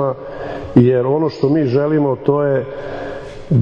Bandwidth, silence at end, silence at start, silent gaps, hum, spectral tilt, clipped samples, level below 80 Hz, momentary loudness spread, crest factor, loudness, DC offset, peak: 7.2 kHz; 0 s; 0 s; none; none; -10 dB/octave; under 0.1%; -42 dBFS; 14 LU; 16 dB; -16 LUFS; under 0.1%; 0 dBFS